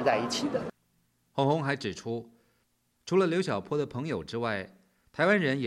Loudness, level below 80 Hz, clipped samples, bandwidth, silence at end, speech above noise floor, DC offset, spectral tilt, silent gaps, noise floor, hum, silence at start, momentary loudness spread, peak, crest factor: -30 LUFS; -66 dBFS; under 0.1%; 13 kHz; 0 s; 44 dB; under 0.1%; -5.5 dB/octave; none; -73 dBFS; none; 0 s; 13 LU; -10 dBFS; 20 dB